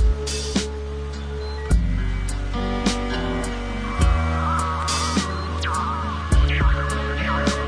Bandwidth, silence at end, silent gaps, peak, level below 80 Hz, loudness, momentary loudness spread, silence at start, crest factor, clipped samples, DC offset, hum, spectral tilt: 10.5 kHz; 0 s; none; -6 dBFS; -24 dBFS; -23 LUFS; 8 LU; 0 s; 16 dB; under 0.1%; under 0.1%; none; -5 dB/octave